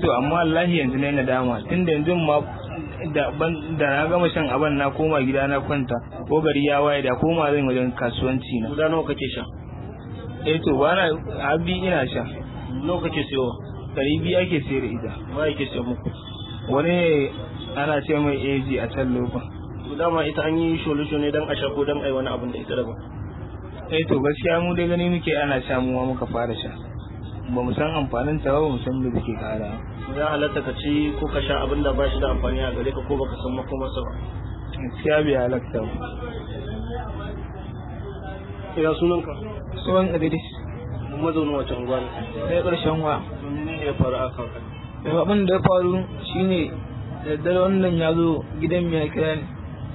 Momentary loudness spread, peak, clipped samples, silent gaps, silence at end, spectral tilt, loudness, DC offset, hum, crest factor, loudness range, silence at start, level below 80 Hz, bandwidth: 13 LU; -4 dBFS; under 0.1%; none; 0 s; -11 dB/octave; -23 LUFS; under 0.1%; none; 20 dB; 4 LU; 0 s; -38 dBFS; 4.1 kHz